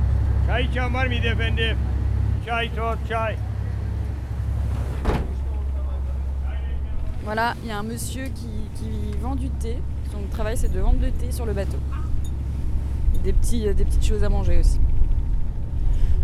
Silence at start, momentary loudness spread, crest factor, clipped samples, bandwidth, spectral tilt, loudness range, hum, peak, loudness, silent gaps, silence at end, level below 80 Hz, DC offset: 0 s; 7 LU; 14 dB; under 0.1%; 13 kHz; -6 dB/octave; 4 LU; none; -6 dBFS; -26 LUFS; none; 0 s; -22 dBFS; under 0.1%